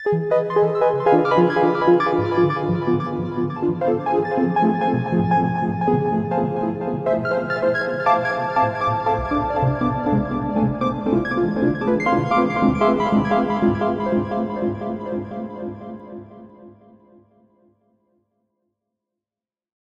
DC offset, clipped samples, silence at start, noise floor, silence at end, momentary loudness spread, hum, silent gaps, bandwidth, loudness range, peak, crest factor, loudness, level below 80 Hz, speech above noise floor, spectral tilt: under 0.1%; under 0.1%; 0 s; under -90 dBFS; 3.3 s; 8 LU; none; none; 7.4 kHz; 9 LU; -4 dBFS; 16 dB; -20 LUFS; -46 dBFS; over 71 dB; -8.5 dB/octave